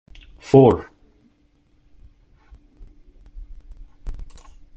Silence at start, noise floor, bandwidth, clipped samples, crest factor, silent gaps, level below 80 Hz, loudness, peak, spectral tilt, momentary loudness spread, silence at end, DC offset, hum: 0.55 s; -60 dBFS; 8 kHz; under 0.1%; 22 dB; none; -40 dBFS; -16 LUFS; -2 dBFS; -9 dB/octave; 29 LU; 0.5 s; under 0.1%; none